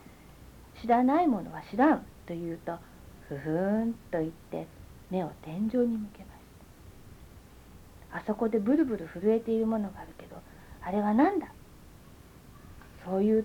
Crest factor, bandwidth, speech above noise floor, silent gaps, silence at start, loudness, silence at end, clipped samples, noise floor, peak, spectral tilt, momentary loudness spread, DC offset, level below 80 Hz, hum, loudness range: 20 dB; 19 kHz; 24 dB; none; 0.4 s; -30 LUFS; 0 s; under 0.1%; -52 dBFS; -12 dBFS; -8 dB/octave; 21 LU; under 0.1%; -56 dBFS; none; 6 LU